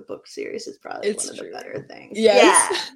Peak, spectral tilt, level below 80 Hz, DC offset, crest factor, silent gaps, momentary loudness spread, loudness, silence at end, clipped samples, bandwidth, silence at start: -2 dBFS; -1.5 dB/octave; -72 dBFS; under 0.1%; 20 dB; none; 21 LU; -17 LUFS; 0.05 s; under 0.1%; 16 kHz; 0 s